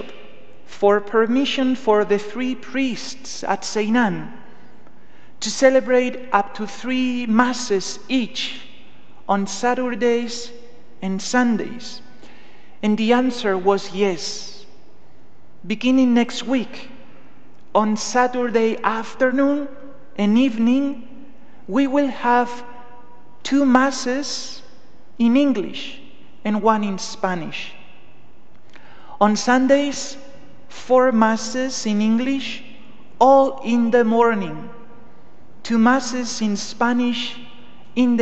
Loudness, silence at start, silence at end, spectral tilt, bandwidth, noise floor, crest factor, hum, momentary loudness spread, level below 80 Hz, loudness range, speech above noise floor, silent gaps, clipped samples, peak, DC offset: -20 LUFS; 0 s; 0 s; -4.5 dB/octave; 8.8 kHz; -52 dBFS; 20 dB; none; 16 LU; -62 dBFS; 5 LU; 33 dB; none; under 0.1%; 0 dBFS; 3%